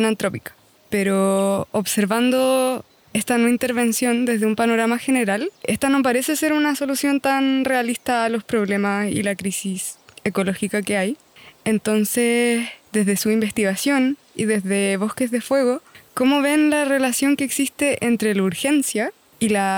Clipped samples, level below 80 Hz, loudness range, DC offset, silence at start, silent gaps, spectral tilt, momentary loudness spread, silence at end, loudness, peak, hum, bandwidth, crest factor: under 0.1%; -62 dBFS; 3 LU; under 0.1%; 0 s; none; -4 dB/octave; 7 LU; 0 s; -20 LUFS; -8 dBFS; none; over 20 kHz; 12 dB